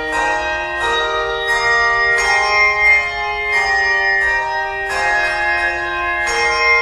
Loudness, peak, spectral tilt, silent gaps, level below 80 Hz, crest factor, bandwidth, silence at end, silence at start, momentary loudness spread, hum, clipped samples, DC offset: -14 LUFS; -2 dBFS; -1.5 dB/octave; none; -38 dBFS; 14 dB; 13 kHz; 0 s; 0 s; 7 LU; none; under 0.1%; under 0.1%